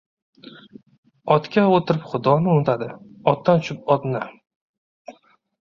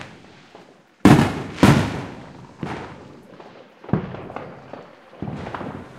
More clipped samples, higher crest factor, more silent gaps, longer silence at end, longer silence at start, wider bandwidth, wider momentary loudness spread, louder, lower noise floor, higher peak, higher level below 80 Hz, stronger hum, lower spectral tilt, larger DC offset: neither; about the same, 20 dB vs 22 dB; first, 0.98-1.03 s, 4.56-5.05 s vs none; first, 0.5 s vs 0 s; first, 0.45 s vs 0 s; second, 7.2 kHz vs 16 kHz; second, 11 LU vs 26 LU; about the same, -20 LUFS vs -20 LUFS; first, -52 dBFS vs -48 dBFS; about the same, -2 dBFS vs 0 dBFS; second, -60 dBFS vs -44 dBFS; neither; first, -8 dB/octave vs -6.5 dB/octave; neither